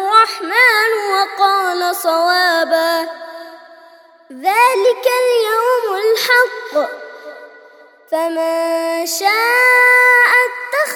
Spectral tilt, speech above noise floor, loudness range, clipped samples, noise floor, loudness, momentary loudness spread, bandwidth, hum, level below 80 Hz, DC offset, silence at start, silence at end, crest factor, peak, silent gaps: 1 dB/octave; 30 dB; 5 LU; under 0.1%; -44 dBFS; -13 LUFS; 13 LU; over 20 kHz; none; -78 dBFS; under 0.1%; 0 s; 0 s; 14 dB; 0 dBFS; none